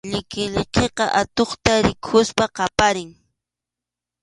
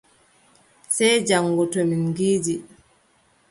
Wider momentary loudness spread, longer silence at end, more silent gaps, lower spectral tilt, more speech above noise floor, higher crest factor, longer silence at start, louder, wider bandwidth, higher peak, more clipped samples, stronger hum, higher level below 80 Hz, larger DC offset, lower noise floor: about the same, 7 LU vs 8 LU; first, 1.1 s vs 0.85 s; neither; about the same, -4 dB/octave vs -4 dB/octave; first, 67 dB vs 40 dB; about the same, 22 dB vs 18 dB; second, 0.05 s vs 0.9 s; about the same, -20 LUFS vs -21 LUFS; about the same, 11.5 kHz vs 11.5 kHz; first, 0 dBFS vs -6 dBFS; neither; neither; first, -40 dBFS vs -62 dBFS; neither; first, -87 dBFS vs -61 dBFS